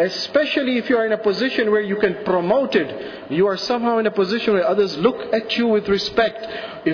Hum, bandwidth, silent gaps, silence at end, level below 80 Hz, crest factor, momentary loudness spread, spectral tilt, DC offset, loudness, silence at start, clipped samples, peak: none; 5.4 kHz; none; 0 s; -54 dBFS; 14 dB; 5 LU; -5.5 dB/octave; under 0.1%; -19 LUFS; 0 s; under 0.1%; -6 dBFS